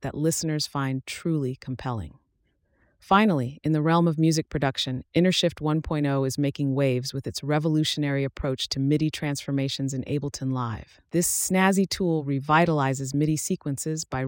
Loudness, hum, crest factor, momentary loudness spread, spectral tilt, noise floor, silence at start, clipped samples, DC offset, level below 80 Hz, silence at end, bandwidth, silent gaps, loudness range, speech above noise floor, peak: -25 LUFS; none; 18 dB; 9 LU; -5 dB/octave; -70 dBFS; 0 s; under 0.1%; under 0.1%; -52 dBFS; 0 s; 17 kHz; none; 3 LU; 46 dB; -8 dBFS